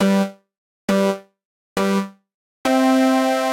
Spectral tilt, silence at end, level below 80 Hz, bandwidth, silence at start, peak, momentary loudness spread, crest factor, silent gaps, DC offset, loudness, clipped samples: -5.5 dB/octave; 0 s; -62 dBFS; 16.5 kHz; 0 s; -6 dBFS; 14 LU; 14 dB; 0.58-0.88 s, 1.45-1.76 s, 2.34-2.64 s; under 0.1%; -19 LUFS; under 0.1%